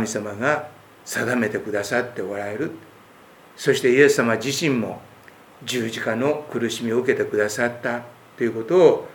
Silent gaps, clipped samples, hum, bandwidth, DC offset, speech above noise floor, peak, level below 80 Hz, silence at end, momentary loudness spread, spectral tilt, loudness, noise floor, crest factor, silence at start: none; under 0.1%; none; 20 kHz; under 0.1%; 27 dB; -2 dBFS; -68 dBFS; 0 s; 14 LU; -4.5 dB/octave; -22 LUFS; -48 dBFS; 22 dB; 0 s